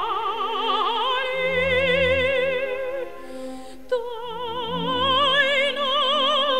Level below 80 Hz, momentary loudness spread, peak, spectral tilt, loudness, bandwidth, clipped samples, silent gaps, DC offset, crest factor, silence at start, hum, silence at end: -52 dBFS; 14 LU; -6 dBFS; -4 dB/octave; -22 LUFS; 15 kHz; under 0.1%; none; 1%; 16 dB; 0 s; none; 0 s